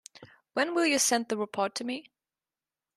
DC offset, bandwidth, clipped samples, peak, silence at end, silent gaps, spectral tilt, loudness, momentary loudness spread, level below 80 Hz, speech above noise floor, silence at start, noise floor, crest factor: under 0.1%; 13.5 kHz; under 0.1%; -12 dBFS; 0.95 s; none; -1.5 dB/octave; -28 LUFS; 12 LU; -80 dBFS; over 61 dB; 0.2 s; under -90 dBFS; 18 dB